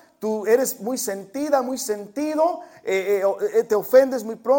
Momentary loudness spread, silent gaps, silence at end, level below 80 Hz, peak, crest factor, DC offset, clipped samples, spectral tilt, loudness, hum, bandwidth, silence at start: 10 LU; none; 0 s; -68 dBFS; -4 dBFS; 18 dB; under 0.1%; under 0.1%; -3.5 dB/octave; -22 LUFS; none; 17 kHz; 0.2 s